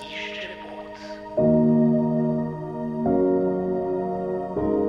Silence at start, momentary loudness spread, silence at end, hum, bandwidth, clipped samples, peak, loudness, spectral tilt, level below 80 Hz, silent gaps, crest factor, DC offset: 0 s; 17 LU; 0 s; none; 6.6 kHz; under 0.1%; -8 dBFS; -23 LUFS; -8.5 dB/octave; -50 dBFS; none; 14 dB; under 0.1%